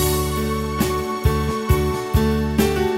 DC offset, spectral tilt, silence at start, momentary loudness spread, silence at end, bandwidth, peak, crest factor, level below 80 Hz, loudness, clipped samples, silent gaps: under 0.1%; -5.5 dB/octave; 0 s; 3 LU; 0 s; 16.5 kHz; -4 dBFS; 16 dB; -26 dBFS; -21 LUFS; under 0.1%; none